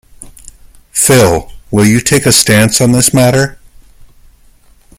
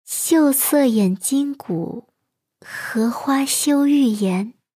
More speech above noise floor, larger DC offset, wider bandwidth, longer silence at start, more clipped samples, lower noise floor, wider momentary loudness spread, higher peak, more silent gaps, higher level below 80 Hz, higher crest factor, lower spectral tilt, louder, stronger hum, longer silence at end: second, 35 dB vs 58 dB; neither; first, over 20 kHz vs 17.5 kHz; about the same, 0.2 s vs 0.1 s; first, 0.2% vs under 0.1%; second, -44 dBFS vs -77 dBFS; about the same, 10 LU vs 11 LU; first, 0 dBFS vs -6 dBFS; neither; first, -36 dBFS vs -74 dBFS; about the same, 12 dB vs 14 dB; about the same, -4 dB/octave vs -4.5 dB/octave; first, -9 LUFS vs -18 LUFS; neither; first, 1.45 s vs 0.25 s